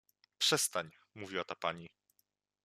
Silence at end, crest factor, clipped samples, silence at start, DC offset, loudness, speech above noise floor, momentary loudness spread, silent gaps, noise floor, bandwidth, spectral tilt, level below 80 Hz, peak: 0.8 s; 24 dB; under 0.1%; 0.4 s; under 0.1%; -35 LUFS; 43 dB; 20 LU; none; -80 dBFS; 14.5 kHz; -1.5 dB/octave; -82 dBFS; -16 dBFS